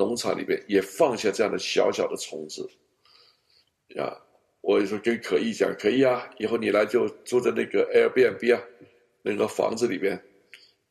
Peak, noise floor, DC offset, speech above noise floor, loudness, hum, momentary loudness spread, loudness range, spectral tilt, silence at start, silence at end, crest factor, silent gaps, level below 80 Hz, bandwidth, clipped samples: -8 dBFS; -66 dBFS; under 0.1%; 41 dB; -25 LUFS; none; 12 LU; 7 LU; -4.5 dB/octave; 0 s; 0.35 s; 18 dB; none; -70 dBFS; 14 kHz; under 0.1%